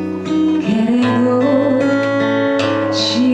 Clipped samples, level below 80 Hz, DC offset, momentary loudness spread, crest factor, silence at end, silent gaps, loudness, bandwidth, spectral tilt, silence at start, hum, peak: under 0.1%; -56 dBFS; under 0.1%; 2 LU; 12 dB; 0 s; none; -15 LUFS; 9 kHz; -5.5 dB/octave; 0 s; none; -2 dBFS